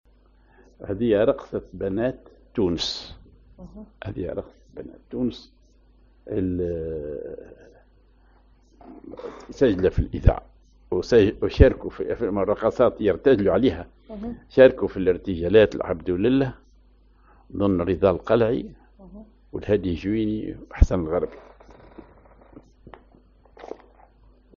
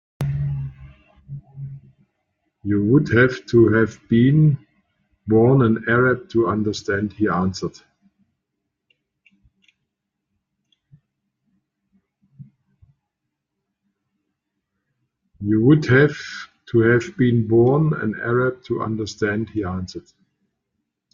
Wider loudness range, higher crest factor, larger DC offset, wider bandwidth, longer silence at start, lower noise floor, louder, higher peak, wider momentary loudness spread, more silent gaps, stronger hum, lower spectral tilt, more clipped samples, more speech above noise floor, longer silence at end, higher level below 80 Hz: first, 12 LU vs 9 LU; first, 24 dB vs 18 dB; neither; about the same, 7.2 kHz vs 7.4 kHz; first, 0.8 s vs 0.2 s; second, -56 dBFS vs -80 dBFS; second, -23 LUFS vs -19 LUFS; about the same, 0 dBFS vs -2 dBFS; first, 22 LU vs 19 LU; neither; neither; second, -6 dB/octave vs -8 dB/octave; neither; second, 34 dB vs 62 dB; second, 0.8 s vs 1.15 s; first, -34 dBFS vs -52 dBFS